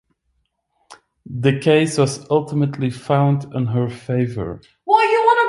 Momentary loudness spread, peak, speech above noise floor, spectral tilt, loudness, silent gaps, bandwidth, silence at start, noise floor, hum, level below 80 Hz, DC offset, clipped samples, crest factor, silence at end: 10 LU; -2 dBFS; 51 dB; -6.5 dB/octave; -18 LUFS; none; 11.5 kHz; 1.3 s; -69 dBFS; none; -52 dBFS; under 0.1%; under 0.1%; 16 dB; 0 s